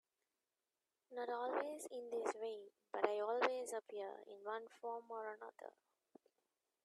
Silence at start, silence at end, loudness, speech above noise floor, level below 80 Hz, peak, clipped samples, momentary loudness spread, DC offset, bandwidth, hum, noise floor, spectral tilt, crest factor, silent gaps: 1.1 s; 1.15 s; -45 LUFS; over 45 dB; under -90 dBFS; -20 dBFS; under 0.1%; 15 LU; under 0.1%; 13.5 kHz; none; under -90 dBFS; -2 dB/octave; 26 dB; none